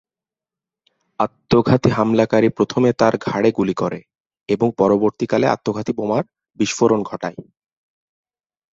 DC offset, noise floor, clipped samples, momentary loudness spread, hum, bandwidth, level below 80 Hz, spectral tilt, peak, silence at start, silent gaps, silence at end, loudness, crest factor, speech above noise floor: under 0.1%; -90 dBFS; under 0.1%; 8 LU; none; 7.8 kHz; -52 dBFS; -6.5 dB/octave; -2 dBFS; 1.2 s; 4.20-4.24 s; 1.3 s; -18 LUFS; 18 dB; 72 dB